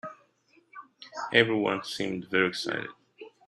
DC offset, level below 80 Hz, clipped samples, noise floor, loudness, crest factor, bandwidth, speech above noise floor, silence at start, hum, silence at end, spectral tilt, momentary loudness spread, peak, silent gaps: under 0.1%; -72 dBFS; under 0.1%; -65 dBFS; -27 LUFS; 26 dB; 13 kHz; 38 dB; 0.05 s; none; 0.2 s; -4.5 dB/octave; 23 LU; -4 dBFS; none